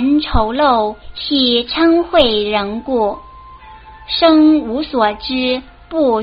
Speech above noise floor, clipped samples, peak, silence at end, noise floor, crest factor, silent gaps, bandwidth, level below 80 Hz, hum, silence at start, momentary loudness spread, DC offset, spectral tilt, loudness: 23 dB; under 0.1%; 0 dBFS; 0 s; -37 dBFS; 14 dB; none; 5.4 kHz; -32 dBFS; none; 0 s; 10 LU; under 0.1%; -2.5 dB/octave; -14 LUFS